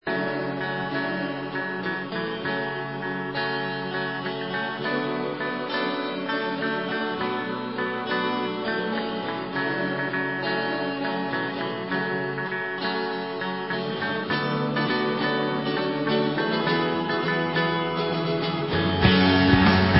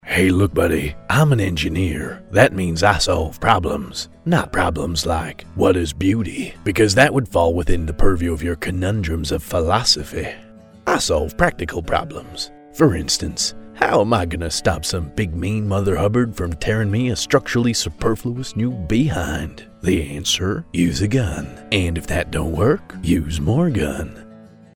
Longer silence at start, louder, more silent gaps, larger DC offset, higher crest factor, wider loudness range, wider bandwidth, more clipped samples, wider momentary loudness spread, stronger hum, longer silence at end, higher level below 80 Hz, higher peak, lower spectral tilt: about the same, 0.05 s vs 0.05 s; second, -25 LUFS vs -19 LUFS; neither; neither; about the same, 22 dB vs 18 dB; about the same, 4 LU vs 3 LU; second, 5.8 kHz vs 17 kHz; neither; second, 6 LU vs 10 LU; neither; second, 0 s vs 0.3 s; second, -46 dBFS vs -32 dBFS; second, -4 dBFS vs 0 dBFS; first, -10 dB/octave vs -5 dB/octave